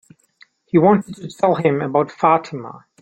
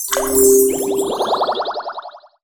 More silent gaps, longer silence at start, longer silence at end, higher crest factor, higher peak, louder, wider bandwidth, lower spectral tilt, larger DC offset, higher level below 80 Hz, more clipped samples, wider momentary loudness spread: neither; first, 0.75 s vs 0 s; about the same, 0.25 s vs 0.25 s; about the same, 16 dB vs 16 dB; about the same, -2 dBFS vs -2 dBFS; about the same, -17 LUFS vs -15 LUFS; second, 9 kHz vs over 20 kHz; first, -8 dB/octave vs -2 dB/octave; neither; second, -60 dBFS vs -46 dBFS; neither; first, 18 LU vs 15 LU